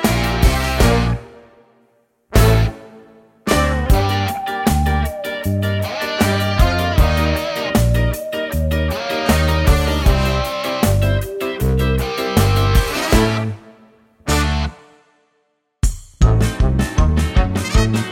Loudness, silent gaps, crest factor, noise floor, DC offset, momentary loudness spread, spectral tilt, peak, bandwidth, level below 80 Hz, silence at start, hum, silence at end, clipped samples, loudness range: -17 LUFS; none; 16 dB; -66 dBFS; under 0.1%; 8 LU; -5.5 dB/octave; 0 dBFS; 17 kHz; -20 dBFS; 0 s; none; 0 s; under 0.1%; 2 LU